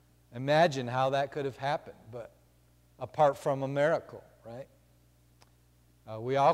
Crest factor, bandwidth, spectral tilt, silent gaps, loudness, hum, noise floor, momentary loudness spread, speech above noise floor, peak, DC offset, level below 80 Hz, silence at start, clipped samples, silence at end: 18 dB; 15 kHz; -6 dB/octave; none; -30 LUFS; 60 Hz at -65 dBFS; -64 dBFS; 22 LU; 34 dB; -12 dBFS; under 0.1%; -68 dBFS; 0.3 s; under 0.1%; 0 s